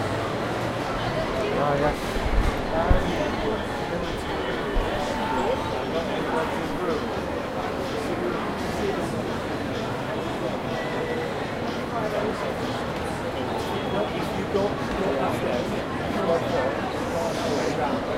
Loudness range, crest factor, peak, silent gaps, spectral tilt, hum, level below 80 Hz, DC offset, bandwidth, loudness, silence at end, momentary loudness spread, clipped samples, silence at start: 3 LU; 20 dB; -6 dBFS; none; -5.5 dB/octave; none; -36 dBFS; under 0.1%; 16 kHz; -27 LUFS; 0 s; 5 LU; under 0.1%; 0 s